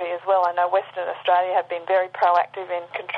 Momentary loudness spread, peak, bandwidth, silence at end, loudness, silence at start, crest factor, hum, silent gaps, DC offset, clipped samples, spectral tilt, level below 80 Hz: 9 LU; -8 dBFS; 5.8 kHz; 0 s; -22 LUFS; 0 s; 14 dB; 50 Hz at -65 dBFS; none; under 0.1%; under 0.1%; -5 dB/octave; -84 dBFS